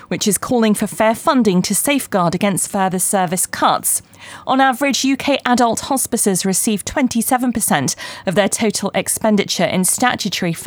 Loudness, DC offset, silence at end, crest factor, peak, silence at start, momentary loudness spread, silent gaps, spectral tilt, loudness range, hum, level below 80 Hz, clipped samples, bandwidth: -16 LUFS; under 0.1%; 0 s; 16 dB; 0 dBFS; 0.1 s; 4 LU; none; -3.5 dB/octave; 1 LU; none; -50 dBFS; under 0.1%; over 20 kHz